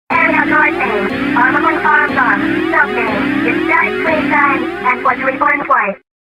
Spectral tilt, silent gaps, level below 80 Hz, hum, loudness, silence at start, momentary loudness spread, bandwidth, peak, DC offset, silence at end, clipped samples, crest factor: -6 dB/octave; none; -44 dBFS; none; -12 LUFS; 0.1 s; 4 LU; 15.5 kHz; 0 dBFS; under 0.1%; 0.4 s; under 0.1%; 14 dB